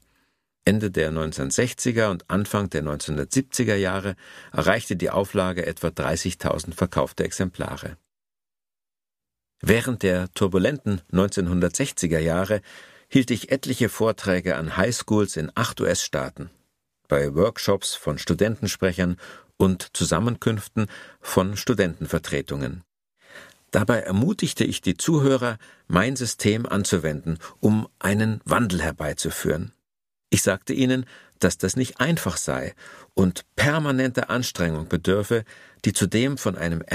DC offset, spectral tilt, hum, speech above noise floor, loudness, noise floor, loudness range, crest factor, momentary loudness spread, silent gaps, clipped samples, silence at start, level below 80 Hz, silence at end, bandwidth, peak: under 0.1%; -5 dB/octave; none; over 67 dB; -24 LUFS; under -90 dBFS; 3 LU; 22 dB; 7 LU; none; under 0.1%; 0.65 s; -46 dBFS; 0 s; 15.5 kHz; -2 dBFS